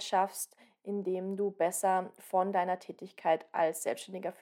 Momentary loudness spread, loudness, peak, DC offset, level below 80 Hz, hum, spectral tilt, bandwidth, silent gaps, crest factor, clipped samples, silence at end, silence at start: 10 LU; -33 LUFS; -16 dBFS; under 0.1%; under -90 dBFS; none; -4 dB/octave; 17.5 kHz; none; 18 dB; under 0.1%; 0.1 s; 0 s